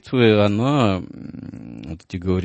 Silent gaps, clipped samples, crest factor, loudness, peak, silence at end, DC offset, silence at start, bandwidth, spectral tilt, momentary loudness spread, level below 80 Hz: none; under 0.1%; 18 dB; -18 LUFS; -2 dBFS; 0 s; under 0.1%; 0.05 s; 8.6 kHz; -7.5 dB/octave; 20 LU; -48 dBFS